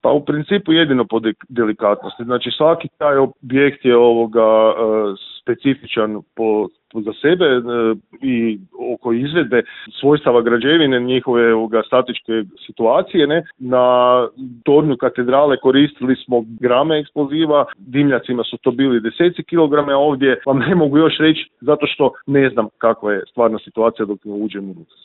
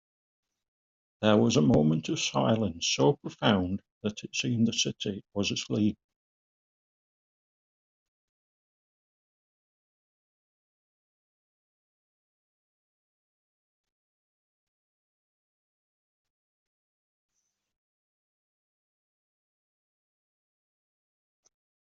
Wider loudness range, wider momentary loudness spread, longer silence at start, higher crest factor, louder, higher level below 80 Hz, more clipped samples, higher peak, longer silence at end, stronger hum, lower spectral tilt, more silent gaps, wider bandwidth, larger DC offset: second, 3 LU vs 9 LU; second, 9 LU vs 12 LU; second, 0.05 s vs 1.2 s; second, 16 dB vs 24 dB; first, -16 LUFS vs -27 LUFS; first, -58 dBFS vs -66 dBFS; neither; first, 0 dBFS vs -8 dBFS; second, 0.2 s vs 16.05 s; neither; first, -11 dB/octave vs -5 dB/octave; second, none vs 3.92-4.01 s; second, 4.2 kHz vs 7.6 kHz; neither